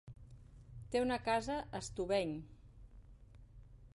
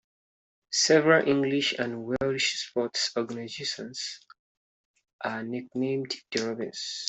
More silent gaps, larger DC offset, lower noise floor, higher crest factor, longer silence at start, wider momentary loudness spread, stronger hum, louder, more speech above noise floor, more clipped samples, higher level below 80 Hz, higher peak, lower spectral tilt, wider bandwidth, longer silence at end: second, none vs 4.39-4.94 s, 5.13-5.19 s; neither; second, -58 dBFS vs under -90 dBFS; about the same, 18 dB vs 22 dB; second, 0.05 s vs 0.7 s; first, 23 LU vs 13 LU; neither; second, -38 LUFS vs -27 LUFS; second, 21 dB vs over 62 dB; neither; first, -58 dBFS vs -66 dBFS; second, -24 dBFS vs -8 dBFS; first, -5 dB/octave vs -3 dB/octave; first, 11.5 kHz vs 8.4 kHz; about the same, 0.05 s vs 0 s